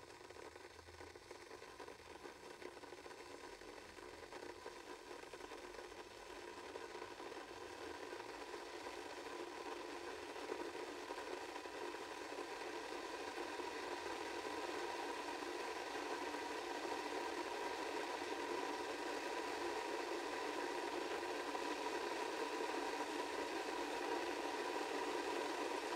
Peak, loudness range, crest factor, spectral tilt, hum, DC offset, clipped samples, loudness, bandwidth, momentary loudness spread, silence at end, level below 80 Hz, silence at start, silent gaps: -30 dBFS; 11 LU; 18 dB; -2.5 dB/octave; none; under 0.1%; under 0.1%; -46 LUFS; 16 kHz; 12 LU; 0 s; -76 dBFS; 0 s; none